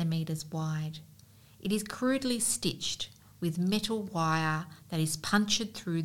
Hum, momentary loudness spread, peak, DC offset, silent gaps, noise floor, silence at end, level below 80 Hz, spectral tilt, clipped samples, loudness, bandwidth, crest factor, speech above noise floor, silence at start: none; 9 LU; -14 dBFS; 0.1%; none; -57 dBFS; 0 s; -62 dBFS; -4 dB/octave; under 0.1%; -31 LUFS; 17.5 kHz; 18 dB; 25 dB; 0 s